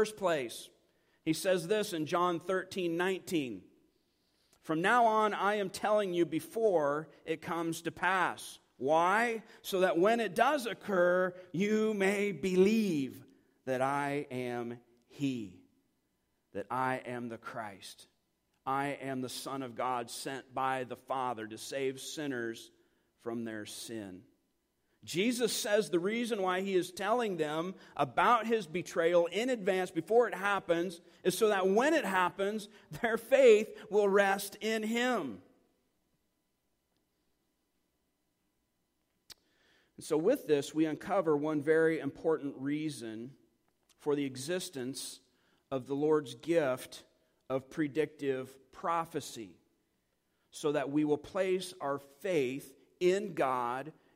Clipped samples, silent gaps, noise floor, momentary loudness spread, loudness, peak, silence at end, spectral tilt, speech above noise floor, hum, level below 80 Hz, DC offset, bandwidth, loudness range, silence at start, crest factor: under 0.1%; none; -80 dBFS; 14 LU; -32 LUFS; -12 dBFS; 0.25 s; -4.5 dB/octave; 48 dB; none; -74 dBFS; under 0.1%; 16 kHz; 9 LU; 0 s; 22 dB